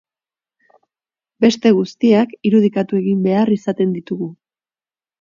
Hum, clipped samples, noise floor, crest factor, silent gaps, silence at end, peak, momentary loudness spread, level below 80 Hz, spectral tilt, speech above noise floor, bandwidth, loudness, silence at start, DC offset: none; under 0.1%; under -90 dBFS; 18 dB; none; 0.85 s; 0 dBFS; 9 LU; -64 dBFS; -7 dB/octave; over 75 dB; 7.4 kHz; -16 LUFS; 1.4 s; under 0.1%